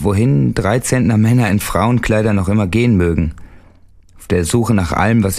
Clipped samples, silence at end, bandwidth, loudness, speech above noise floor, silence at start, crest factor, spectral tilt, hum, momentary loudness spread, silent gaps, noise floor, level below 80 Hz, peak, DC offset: under 0.1%; 0 s; 15.5 kHz; -15 LUFS; 32 dB; 0 s; 14 dB; -6.5 dB/octave; none; 4 LU; none; -45 dBFS; -32 dBFS; 0 dBFS; 0.1%